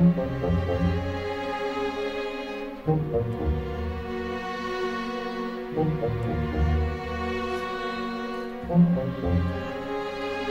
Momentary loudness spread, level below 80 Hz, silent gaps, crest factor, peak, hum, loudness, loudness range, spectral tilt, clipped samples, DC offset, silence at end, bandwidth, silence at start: 7 LU; -36 dBFS; none; 18 dB; -10 dBFS; none; -28 LUFS; 3 LU; -8 dB/octave; under 0.1%; under 0.1%; 0 s; 7.8 kHz; 0 s